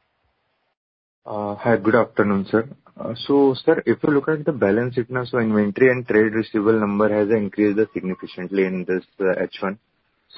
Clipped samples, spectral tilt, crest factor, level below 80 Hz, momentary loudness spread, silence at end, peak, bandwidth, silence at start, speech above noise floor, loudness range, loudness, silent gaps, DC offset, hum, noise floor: under 0.1%; -12 dB/octave; 18 dB; -58 dBFS; 11 LU; 0.6 s; -2 dBFS; 5.8 kHz; 1.25 s; 50 dB; 3 LU; -20 LUFS; none; under 0.1%; none; -70 dBFS